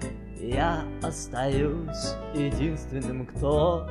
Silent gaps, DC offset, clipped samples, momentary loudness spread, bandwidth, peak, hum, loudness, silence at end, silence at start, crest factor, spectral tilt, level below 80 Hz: none; under 0.1%; under 0.1%; 9 LU; 12 kHz; -12 dBFS; none; -29 LUFS; 0 s; 0 s; 16 dB; -6 dB/octave; -36 dBFS